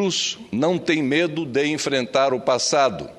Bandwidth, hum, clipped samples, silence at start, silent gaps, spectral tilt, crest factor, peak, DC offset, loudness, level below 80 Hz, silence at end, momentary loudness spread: 12.5 kHz; none; under 0.1%; 0 s; none; -3.5 dB/octave; 16 dB; -4 dBFS; under 0.1%; -21 LUFS; -60 dBFS; 0.05 s; 4 LU